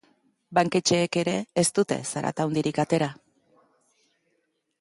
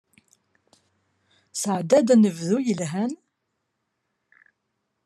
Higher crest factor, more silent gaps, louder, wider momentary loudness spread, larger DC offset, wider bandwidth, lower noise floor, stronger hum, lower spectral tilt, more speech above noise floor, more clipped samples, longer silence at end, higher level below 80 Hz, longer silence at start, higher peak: about the same, 18 dB vs 20 dB; neither; second, -25 LUFS vs -22 LUFS; second, 5 LU vs 13 LU; neither; second, 11.5 kHz vs 13 kHz; second, -74 dBFS vs -78 dBFS; neither; second, -4.5 dB/octave vs -6 dB/octave; second, 49 dB vs 57 dB; neither; second, 1.65 s vs 1.9 s; first, -66 dBFS vs -76 dBFS; second, 0.5 s vs 1.55 s; about the same, -8 dBFS vs -6 dBFS